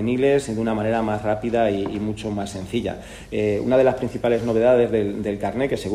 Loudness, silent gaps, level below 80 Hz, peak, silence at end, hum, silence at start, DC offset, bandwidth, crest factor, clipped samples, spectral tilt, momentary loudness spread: -22 LUFS; none; -46 dBFS; -6 dBFS; 0 s; none; 0 s; under 0.1%; 13.5 kHz; 16 dB; under 0.1%; -6.5 dB/octave; 9 LU